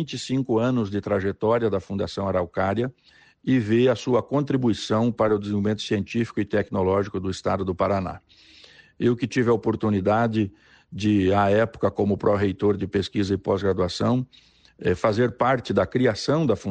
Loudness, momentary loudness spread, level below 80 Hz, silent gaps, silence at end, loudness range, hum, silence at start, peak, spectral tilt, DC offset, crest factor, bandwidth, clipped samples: -23 LUFS; 6 LU; -54 dBFS; none; 0 s; 3 LU; none; 0 s; -8 dBFS; -7 dB/octave; under 0.1%; 14 dB; 9.4 kHz; under 0.1%